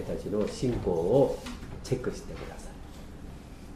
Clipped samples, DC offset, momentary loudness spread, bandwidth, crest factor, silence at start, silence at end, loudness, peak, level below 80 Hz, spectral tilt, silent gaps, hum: under 0.1%; under 0.1%; 21 LU; 15 kHz; 20 dB; 0 s; 0 s; -30 LUFS; -12 dBFS; -44 dBFS; -7 dB/octave; none; none